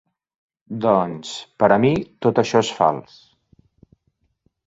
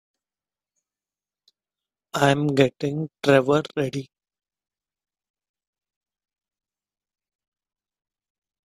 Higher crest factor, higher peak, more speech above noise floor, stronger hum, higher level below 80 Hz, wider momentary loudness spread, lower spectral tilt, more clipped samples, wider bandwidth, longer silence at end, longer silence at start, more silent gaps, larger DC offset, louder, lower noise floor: second, 20 dB vs 26 dB; about the same, -2 dBFS vs -2 dBFS; second, 50 dB vs over 69 dB; second, none vs 50 Hz at -55 dBFS; first, -58 dBFS vs -64 dBFS; first, 15 LU vs 10 LU; about the same, -6 dB/octave vs -6 dB/octave; neither; second, 8 kHz vs 14.5 kHz; second, 1.65 s vs 4.6 s; second, 0.7 s vs 2.15 s; neither; neither; first, -19 LUFS vs -22 LUFS; second, -69 dBFS vs under -90 dBFS